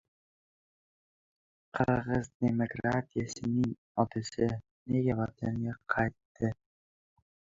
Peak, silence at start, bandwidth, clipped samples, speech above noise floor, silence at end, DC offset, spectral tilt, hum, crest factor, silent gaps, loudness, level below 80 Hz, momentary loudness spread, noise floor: -12 dBFS; 1.75 s; 7.8 kHz; under 0.1%; over 59 dB; 1.05 s; under 0.1%; -7 dB/octave; none; 22 dB; 2.35-2.40 s, 3.78-3.95 s, 4.71-4.86 s, 6.25-6.35 s; -33 LUFS; -58 dBFS; 6 LU; under -90 dBFS